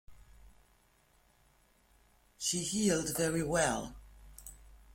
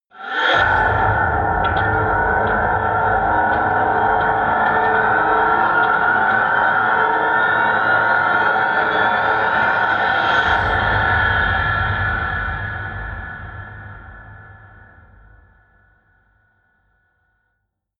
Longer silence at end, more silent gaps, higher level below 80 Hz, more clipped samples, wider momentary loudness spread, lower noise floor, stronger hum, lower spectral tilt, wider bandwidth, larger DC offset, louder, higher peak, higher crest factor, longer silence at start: second, 0.15 s vs 3.45 s; neither; second, -58 dBFS vs -36 dBFS; neither; first, 21 LU vs 10 LU; second, -69 dBFS vs -73 dBFS; neither; second, -3.5 dB/octave vs -6.5 dB/octave; first, 16.5 kHz vs 7 kHz; neither; second, -32 LUFS vs -16 LUFS; second, -16 dBFS vs -4 dBFS; first, 20 dB vs 14 dB; about the same, 0.1 s vs 0.15 s